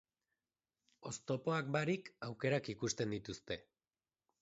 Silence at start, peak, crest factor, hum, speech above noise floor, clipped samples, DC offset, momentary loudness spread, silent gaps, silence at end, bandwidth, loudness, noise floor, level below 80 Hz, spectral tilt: 1 s; -22 dBFS; 20 dB; none; over 50 dB; under 0.1%; under 0.1%; 10 LU; none; 0.8 s; 8 kHz; -40 LUFS; under -90 dBFS; -72 dBFS; -5 dB/octave